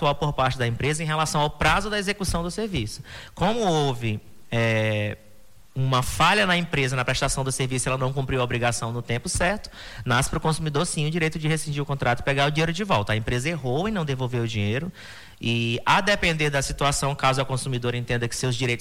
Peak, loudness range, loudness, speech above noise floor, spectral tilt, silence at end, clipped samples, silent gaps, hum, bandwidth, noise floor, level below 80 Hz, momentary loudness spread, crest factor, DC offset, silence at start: -8 dBFS; 2 LU; -24 LUFS; 30 dB; -4.5 dB/octave; 0 s; under 0.1%; none; none; 16 kHz; -54 dBFS; -40 dBFS; 8 LU; 16 dB; under 0.1%; 0 s